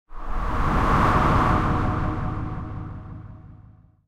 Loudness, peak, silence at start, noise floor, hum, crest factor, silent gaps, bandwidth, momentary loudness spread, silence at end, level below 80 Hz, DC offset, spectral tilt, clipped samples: -23 LUFS; -6 dBFS; 0.1 s; -50 dBFS; none; 18 dB; none; 12.5 kHz; 19 LU; 0.45 s; -30 dBFS; under 0.1%; -7.5 dB/octave; under 0.1%